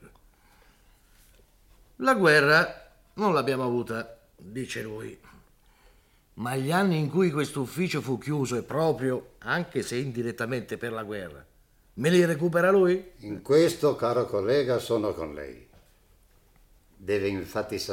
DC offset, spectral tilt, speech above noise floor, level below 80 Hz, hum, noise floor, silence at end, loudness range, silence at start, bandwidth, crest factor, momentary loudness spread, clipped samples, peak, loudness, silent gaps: under 0.1%; -5.5 dB/octave; 34 dB; -60 dBFS; none; -60 dBFS; 0 s; 7 LU; 0.05 s; 17 kHz; 20 dB; 17 LU; under 0.1%; -8 dBFS; -26 LUFS; none